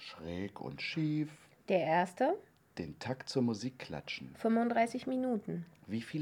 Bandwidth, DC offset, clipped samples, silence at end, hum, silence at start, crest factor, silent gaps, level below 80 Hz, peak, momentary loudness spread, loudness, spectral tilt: 13 kHz; under 0.1%; under 0.1%; 0 s; none; 0 s; 18 dB; none; -70 dBFS; -16 dBFS; 13 LU; -36 LUFS; -6 dB/octave